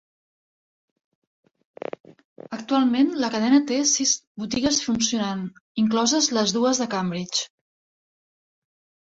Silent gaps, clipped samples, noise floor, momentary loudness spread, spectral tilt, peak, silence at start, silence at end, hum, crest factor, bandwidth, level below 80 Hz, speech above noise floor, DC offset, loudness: 4.27-4.35 s, 5.60-5.75 s; under 0.1%; under -90 dBFS; 17 LU; -3 dB/octave; -8 dBFS; 2.5 s; 1.65 s; none; 18 dB; 8 kHz; -60 dBFS; over 68 dB; under 0.1%; -22 LUFS